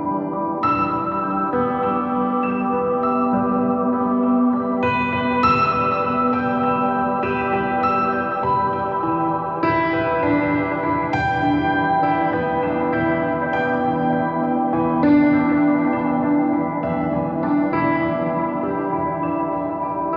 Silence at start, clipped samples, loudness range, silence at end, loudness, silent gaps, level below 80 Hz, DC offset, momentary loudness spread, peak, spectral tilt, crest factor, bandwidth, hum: 0 s; under 0.1%; 2 LU; 0 s; -20 LUFS; none; -48 dBFS; under 0.1%; 5 LU; -6 dBFS; -9 dB/octave; 14 dB; 5.8 kHz; none